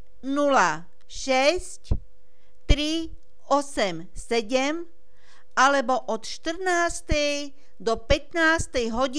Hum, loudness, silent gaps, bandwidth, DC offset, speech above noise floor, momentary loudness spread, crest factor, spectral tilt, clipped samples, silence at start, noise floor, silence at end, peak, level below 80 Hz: none; -25 LUFS; none; 11 kHz; 2%; 37 dB; 13 LU; 22 dB; -3.5 dB/octave; under 0.1%; 0.25 s; -61 dBFS; 0 s; -4 dBFS; -36 dBFS